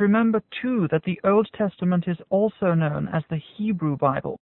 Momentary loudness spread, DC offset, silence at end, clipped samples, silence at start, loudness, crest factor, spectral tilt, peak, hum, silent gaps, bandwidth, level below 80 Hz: 7 LU; under 0.1%; 0.2 s; under 0.1%; 0 s; -24 LUFS; 16 dB; -12.5 dB/octave; -8 dBFS; none; none; 4.1 kHz; -58 dBFS